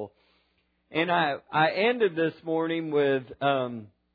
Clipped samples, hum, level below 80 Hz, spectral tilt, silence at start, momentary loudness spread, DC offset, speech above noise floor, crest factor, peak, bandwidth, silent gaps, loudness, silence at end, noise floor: under 0.1%; none; -72 dBFS; -8.5 dB/octave; 0 s; 9 LU; under 0.1%; 45 dB; 18 dB; -10 dBFS; 5 kHz; none; -26 LUFS; 0.3 s; -71 dBFS